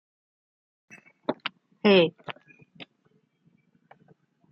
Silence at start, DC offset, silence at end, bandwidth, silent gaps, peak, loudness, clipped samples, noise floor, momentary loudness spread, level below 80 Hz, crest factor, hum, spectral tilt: 1.3 s; under 0.1%; 1.7 s; 6.2 kHz; none; -8 dBFS; -25 LUFS; under 0.1%; -68 dBFS; 28 LU; -76 dBFS; 22 dB; none; -7.5 dB/octave